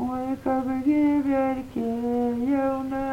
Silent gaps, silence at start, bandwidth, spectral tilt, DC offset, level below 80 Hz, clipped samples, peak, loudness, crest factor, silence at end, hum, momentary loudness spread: none; 0 s; 11 kHz; -7.5 dB/octave; under 0.1%; -50 dBFS; under 0.1%; -12 dBFS; -25 LUFS; 12 dB; 0 s; none; 7 LU